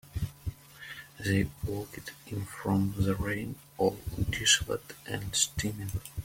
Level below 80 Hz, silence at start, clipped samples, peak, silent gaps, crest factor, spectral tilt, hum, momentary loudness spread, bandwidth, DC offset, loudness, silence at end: -48 dBFS; 0.05 s; under 0.1%; -10 dBFS; none; 22 dB; -3.5 dB/octave; none; 17 LU; 16.5 kHz; under 0.1%; -31 LUFS; 0 s